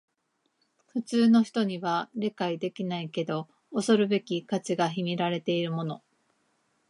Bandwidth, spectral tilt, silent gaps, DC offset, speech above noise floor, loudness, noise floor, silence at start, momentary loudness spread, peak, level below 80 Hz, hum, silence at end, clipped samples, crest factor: 11.5 kHz; -6 dB/octave; none; under 0.1%; 49 dB; -28 LUFS; -76 dBFS; 0.95 s; 12 LU; -10 dBFS; -80 dBFS; none; 0.95 s; under 0.1%; 18 dB